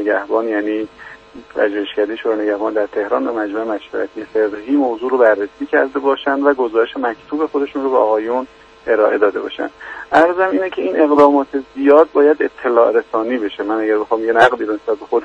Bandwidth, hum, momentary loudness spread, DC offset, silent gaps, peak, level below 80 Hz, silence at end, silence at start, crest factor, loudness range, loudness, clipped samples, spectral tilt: 8 kHz; none; 10 LU; under 0.1%; none; 0 dBFS; -56 dBFS; 0 s; 0 s; 16 dB; 6 LU; -16 LUFS; under 0.1%; -5.5 dB/octave